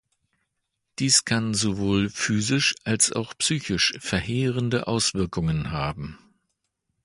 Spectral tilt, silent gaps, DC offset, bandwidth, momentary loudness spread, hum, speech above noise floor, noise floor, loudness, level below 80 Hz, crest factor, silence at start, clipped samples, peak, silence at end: -3.5 dB/octave; none; under 0.1%; 11.5 kHz; 9 LU; none; 55 dB; -79 dBFS; -23 LUFS; -46 dBFS; 20 dB; 1 s; under 0.1%; -6 dBFS; 0.9 s